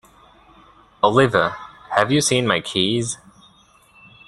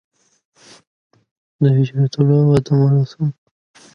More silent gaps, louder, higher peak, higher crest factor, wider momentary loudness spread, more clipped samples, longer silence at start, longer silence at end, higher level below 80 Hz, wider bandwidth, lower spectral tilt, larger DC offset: neither; second, -19 LUFS vs -16 LUFS; about the same, -2 dBFS vs -2 dBFS; about the same, 20 dB vs 16 dB; about the same, 10 LU vs 8 LU; neither; second, 1.05 s vs 1.6 s; first, 1.1 s vs 0.65 s; about the same, -54 dBFS vs -54 dBFS; first, 12.5 kHz vs 6.8 kHz; second, -4 dB/octave vs -9 dB/octave; neither